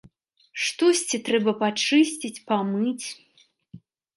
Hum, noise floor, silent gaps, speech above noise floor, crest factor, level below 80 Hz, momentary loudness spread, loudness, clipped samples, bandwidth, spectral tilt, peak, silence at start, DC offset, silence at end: none; -57 dBFS; none; 34 dB; 18 dB; -74 dBFS; 13 LU; -23 LUFS; under 0.1%; 11.5 kHz; -3.5 dB/octave; -8 dBFS; 0.55 s; under 0.1%; 0.4 s